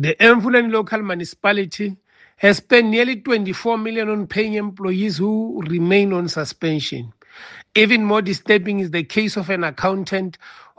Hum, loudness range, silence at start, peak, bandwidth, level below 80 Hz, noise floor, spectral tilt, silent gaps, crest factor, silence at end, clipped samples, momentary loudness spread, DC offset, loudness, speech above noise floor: none; 3 LU; 0 s; 0 dBFS; 9.2 kHz; -60 dBFS; -41 dBFS; -5.5 dB/octave; none; 18 dB; 0.25 s; under 0.1%; 11 LU; under 0.1%; -18 LUFS; 23 dB